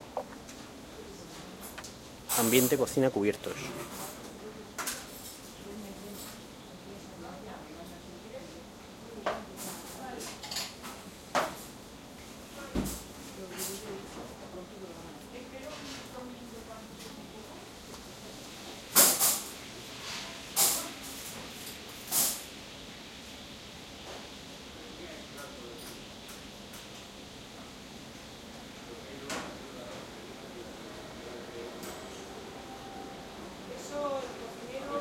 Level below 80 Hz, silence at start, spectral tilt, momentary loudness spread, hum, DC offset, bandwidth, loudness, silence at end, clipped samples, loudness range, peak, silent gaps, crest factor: -58 dBFS; 0 s; -2.5 dB/octave; 18 LU; none; under 0.1%; 16.5 kHz; -34 LUFS; 0 s; under 0.1%; 16 LU; -8 dBFS; none; 30 dB